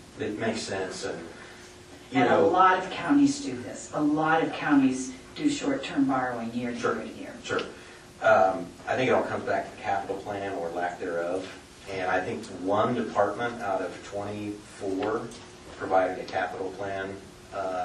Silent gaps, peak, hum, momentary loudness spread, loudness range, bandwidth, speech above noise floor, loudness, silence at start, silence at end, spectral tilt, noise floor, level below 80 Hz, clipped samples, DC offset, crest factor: none; -8 dBFS; none; 16 LU; 6 LU; 11.5 kHz; 20 dB; -28 LUFS; 0 s; 0 s; -5 dB/octave; -47 dBFS; -60 dBFS; under 0.1%; under 0.1%; 20 dB